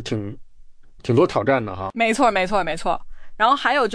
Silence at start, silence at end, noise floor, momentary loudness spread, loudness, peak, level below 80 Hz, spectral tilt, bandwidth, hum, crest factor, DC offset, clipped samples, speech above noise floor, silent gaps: 0 s; 0 s; -42 dBFS; 11 LU; -20 LUFS; -4 dBFS; -42 dBFS; -5.5 dB/octave; 10.5 kHz; none; 16 dB; under 0.1%; under 0.1%; 22 dB; none